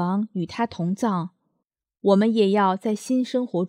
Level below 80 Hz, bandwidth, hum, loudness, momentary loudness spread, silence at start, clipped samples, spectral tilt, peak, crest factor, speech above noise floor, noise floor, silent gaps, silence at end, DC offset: -68 dBFS; 13.5 kHz; none; -23 LUFS; 9 LU; 0 s; under 0.1%; -7 dB/octave; -6 dBFS; 18 dB; 57 dB; -79 dBFS; none; 0 s; under 0.1%